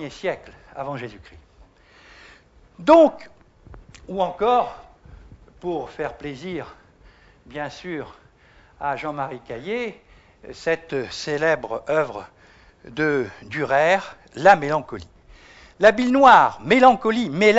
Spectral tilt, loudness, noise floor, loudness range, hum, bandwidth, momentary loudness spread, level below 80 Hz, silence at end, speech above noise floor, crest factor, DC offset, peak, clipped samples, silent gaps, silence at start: -5.5 dB/octave; -20 LUFS; -53 dBFS; 15 LU; none; 8 kHz; 19 LU; -52 dBFS; 0 s; 33 dB; 20 dB; under 0.1%; -2 dBFS; under 0.1%; none; 0 s